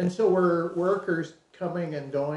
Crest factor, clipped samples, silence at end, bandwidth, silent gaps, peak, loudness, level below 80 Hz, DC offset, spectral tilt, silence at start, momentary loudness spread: 14 dB; under 0.1%; 0 s; 10.5 kHz; none; -12 dBFS; -27 LUFS; -70 dBFS; under 0.1%; -8 dB/octave; 0 s; 11 LU